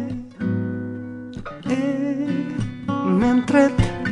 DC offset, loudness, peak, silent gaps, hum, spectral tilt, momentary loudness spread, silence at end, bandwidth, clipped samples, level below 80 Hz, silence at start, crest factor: under 0.1%; -22 LUFS; -4 dBFS; none; none; -7.5 dB/octave; 15 LU; 0 s; 10.5 kHz; under 0.1%; -38 dBFS; 0 s; 18 dB